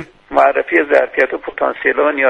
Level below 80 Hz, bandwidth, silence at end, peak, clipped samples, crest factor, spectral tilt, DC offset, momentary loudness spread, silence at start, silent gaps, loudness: -52 dBFS; 8.8 kHz; 0 s; 0 dBFS; under 0.1%; 14 dB; -5.5 dB/octave; under 0.1%; 7 LU; 0 s; none; -14 LUFS